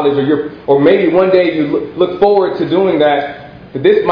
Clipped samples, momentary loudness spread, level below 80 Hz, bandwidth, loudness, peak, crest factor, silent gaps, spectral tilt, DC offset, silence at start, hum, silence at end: 0.1%; 7 LU; -48 dBFS; 5.2 kHz; -12 LUFS; 0 dBFS; 12 dB; none; -9 dB/octave; under 0.1%; 0 s; none; 0 s